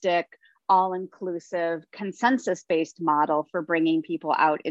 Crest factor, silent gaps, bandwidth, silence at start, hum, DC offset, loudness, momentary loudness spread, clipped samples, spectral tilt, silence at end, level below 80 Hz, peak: 18 dB; none; 8 kHz; 0 s; none; under 0.1%; -25 LUFS; 11 LU; under 0.1%; -5.5 dB/octave; 0 s; -78 dBFS; -8 dBFS